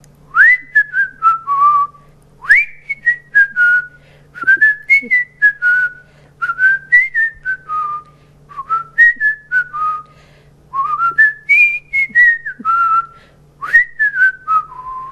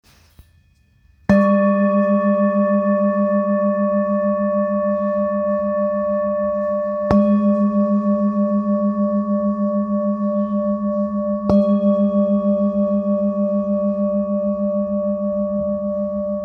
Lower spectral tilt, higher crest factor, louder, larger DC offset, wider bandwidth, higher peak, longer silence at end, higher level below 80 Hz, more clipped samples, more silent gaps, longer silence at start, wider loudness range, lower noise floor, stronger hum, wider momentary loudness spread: second, -2.5 dB/octave vs -10.5 dB/octave; about the same, 14 dB vs 16 dB; first, -12 LUFS vs -19 LUFS; neither; first, 13.5 kHz vs 4.4 kHz; about the same, 0 dBFS vs -2 dBFS; about the same, 0 s vs 0 s; about the same, -52 dBFS vs -48 dBFS; neither; neither; second, 0.35 s vs 1.3 s; about the same, 4 LU vs 3 LU; second, -45 dBFS vs -55 dBFS; neither; first, 12 LU vs 5 LU